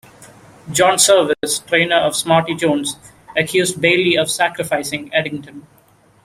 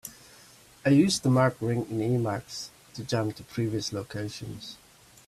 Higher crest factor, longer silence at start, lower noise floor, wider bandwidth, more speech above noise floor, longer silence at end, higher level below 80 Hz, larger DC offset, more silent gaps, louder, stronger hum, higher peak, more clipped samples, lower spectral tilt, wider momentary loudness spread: about the same, 18 dB vs 18 dB; first, 0.2 s vs 0.05 s; second, -43 dBFS vs -54 dBFS; first, 16 kHz vs 14.5 kHz; about the same, 26 dB vs 27 dB; first, 0.65 s vs 0.5 s; about the same, -56 dBFS vs -60 dBFS; neither; neither; first, -16 LUFS vs -28 LUFS; neither; first, 0 dBFS vs -10 dBFS; neither; second, -3 dB/octave vs -5.5 dB/octave; second, 11 LU vs 18 LU